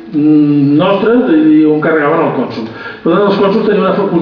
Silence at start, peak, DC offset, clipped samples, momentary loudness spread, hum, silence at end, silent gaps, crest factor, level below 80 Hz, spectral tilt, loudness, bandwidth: 0 s; 0 dBFS; under 0.1%; under 0.1%; 9 LU; none; 0 s; none; 8 dB; -52 dBFS; -9.5 dB/octave; -10 LUFS; 5.4 kHz